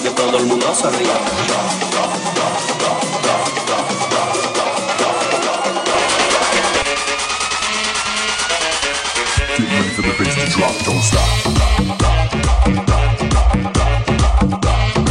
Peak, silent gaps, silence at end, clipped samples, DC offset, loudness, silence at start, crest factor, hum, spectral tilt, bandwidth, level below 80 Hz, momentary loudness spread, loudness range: -2 dBFS; none; 0 s; under 0.1%; under 0.1%; -16 LUFS; 0 s; 14 dB; none; -3.5 dB/octave; 13 kHz; -22 dBFS; 3 LU; 2 LU